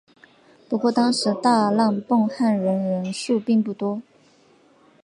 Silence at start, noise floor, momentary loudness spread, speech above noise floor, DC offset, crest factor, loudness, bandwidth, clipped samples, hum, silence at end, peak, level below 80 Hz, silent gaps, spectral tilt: 0.7 s; -56 dBFS; 8 LU; 35 dB; under 0.1%; 16 dB; -21 LUFS; 11.5 kHz; under 0.1%; none; 1.05 s; -6 dBFS; -74 dBFS; none; -5.5 dB/octave